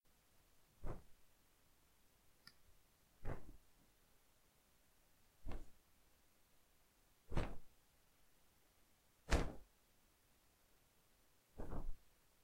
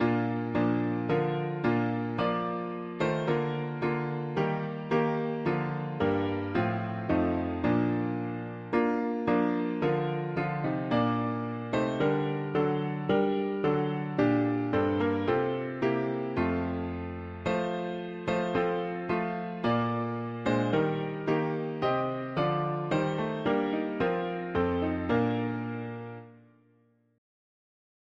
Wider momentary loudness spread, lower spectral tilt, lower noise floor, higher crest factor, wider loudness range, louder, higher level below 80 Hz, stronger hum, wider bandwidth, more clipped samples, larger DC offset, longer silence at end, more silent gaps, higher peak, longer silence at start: first, 24 LU vs 6 LU; second, -5.5 dB/octave vs -8.5 dB/octave; first, -75 dBFS vs -66 dBFS; first, 32 dB vs 16 dB; first, 14 LU vs 3 LU; second, -50 LUFS vs -30 LUFS; about the same, -54 dBFS vs -58 dBFS; neither; first, 16 kHz vs 7.4 kHz; neither; neither; second, 0.5 s vs 1.8 s; neither; second, -18 dBFS vs -14 dBFS; first, 0.8 s vs 0 s